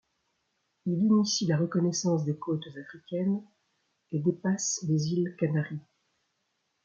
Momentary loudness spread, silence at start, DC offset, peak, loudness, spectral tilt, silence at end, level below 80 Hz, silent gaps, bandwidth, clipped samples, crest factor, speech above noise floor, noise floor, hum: 12 LU; 0.85 s; under 0.1%; -14 dBFS; -29 LUFS; -5.5 dB/octave; 1.05 s; -72 dBFS; none; 7.8 kHz; under 0.1%; 16 dB; 50 dB; -78 dBFS; none